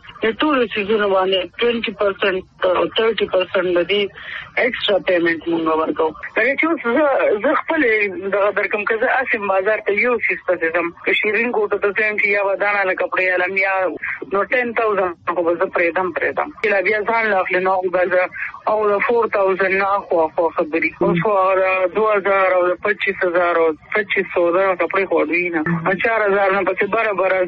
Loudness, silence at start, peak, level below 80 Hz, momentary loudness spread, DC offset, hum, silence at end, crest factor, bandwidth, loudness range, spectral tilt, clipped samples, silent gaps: -17 LUFS; 0.05 s; -4 dBFS; -56 dBFS; 4 LU; under 0.1%; none; 0 s; 14 dB; 5.6 kHz; 2 LU; -2.5 dB/octave; under 0.1%; none